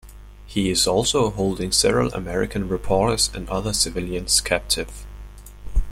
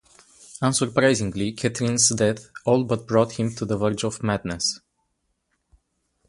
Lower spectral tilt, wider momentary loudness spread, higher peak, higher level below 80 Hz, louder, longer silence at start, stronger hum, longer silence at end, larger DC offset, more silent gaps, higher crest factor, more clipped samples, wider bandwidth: about the same, -3.5 dB/octave vs -4 dB/octave; first, 11 LU vs 8 LU; about the same, -4 dBFS vs -4 dBFS; first, -32 dBFS vs -52 dBFS; about the same, -21 LUFS vs -23 LUFS; second, 0.05 s vs 0.5 s; first, 50 Hz at -35 dBFS vs none; second, 0 s vs 1.5 s; neither; neither; about the same, 18 dB vs 20 dB; neither; first, 16.5 kHz vs 11.5 kHz